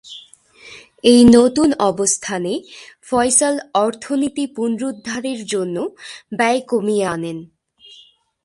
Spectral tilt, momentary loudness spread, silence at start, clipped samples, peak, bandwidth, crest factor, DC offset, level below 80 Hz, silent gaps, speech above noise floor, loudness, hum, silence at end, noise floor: -3.5 dB/octave; 17 LU; 0.05 s; under 0.1%; 0 dBFS; 11.5 kHz; 18 dB; under 0.1%; -48 dBFS; none; 33 dB; -17 LUFS; none; 1 s; -49 dBFS